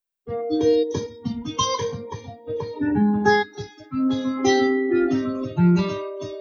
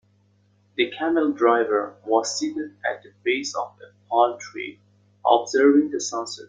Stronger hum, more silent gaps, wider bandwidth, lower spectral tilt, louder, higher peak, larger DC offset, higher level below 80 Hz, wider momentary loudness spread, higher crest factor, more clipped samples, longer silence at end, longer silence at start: neither; neither; second, 7.2 kHz vs 9.4 kHz; first, -5.5 dB/octave vs -2.5 dB/octave; about the same, -22 LUFS vs -22 LUFS; about the same, -6 dBFS vs -4 dBFS; neither; first, -54 dBFS vs -72 dBFS; about the same, 13 LU vs 15 LU; about the same, 16 dB vs 20 dB; neither; about the same, 0 s vs 0.05 s; second, 0.25 s vs 0.8 s